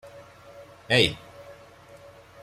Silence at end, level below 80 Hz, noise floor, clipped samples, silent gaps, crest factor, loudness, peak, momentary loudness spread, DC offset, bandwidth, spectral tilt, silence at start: 0.9 s; -56 dBFS; -50 dBFS; under 0.1%; none; 24 dB; -22 LUFS; -6 dBFS; 27 LU; under 0.1%; 15.5 kHz; -4 dB/octave; 0.05 s